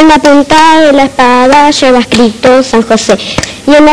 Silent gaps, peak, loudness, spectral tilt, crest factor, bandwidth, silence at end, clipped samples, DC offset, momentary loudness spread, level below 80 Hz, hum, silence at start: none; 0 dBFS; -5 LUFS; -4 dB/octave; 4 dB; 11 kHz; 0 s; 10%; under 0.1%; 5 LU; -30 dBFS; none; 0 s